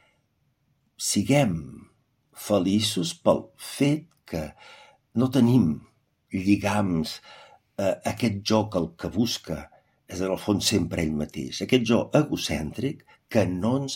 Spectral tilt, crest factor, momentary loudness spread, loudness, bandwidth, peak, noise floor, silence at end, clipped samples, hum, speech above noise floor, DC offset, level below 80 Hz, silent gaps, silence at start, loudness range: -5 dB/octave; 22 dB; 13 LU; -25 LUFS; 16.5 kHz; -4 dBFS; -70 dBFS; 0 s; under 0.1%; none; 46 dB; under 0.1%; -54 dBFS; none; 1 s; 2 LU